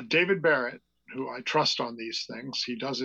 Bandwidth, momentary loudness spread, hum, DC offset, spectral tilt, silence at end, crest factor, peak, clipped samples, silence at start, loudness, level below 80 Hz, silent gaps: 8.2 kHz; 12 LU; none; under 0.1%; -3.5 dB/octave; 0 s; 16 dB; -12 dBFS; under 0.1%; 0 s; -28 LUFS; -78 dBFS; none